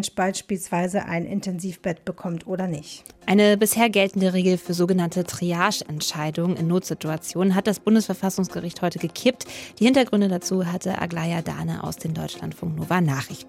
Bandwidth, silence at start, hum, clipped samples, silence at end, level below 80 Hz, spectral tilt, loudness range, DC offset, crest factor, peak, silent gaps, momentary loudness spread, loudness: 16.5 kHz; 0 s; none; under 0.1%; 0 s; -60 dBFS; -5 dB/octave; 4 LU; under 0.1%; 18 dB; -4 dBFS; none; 11 LU; -23 LUFS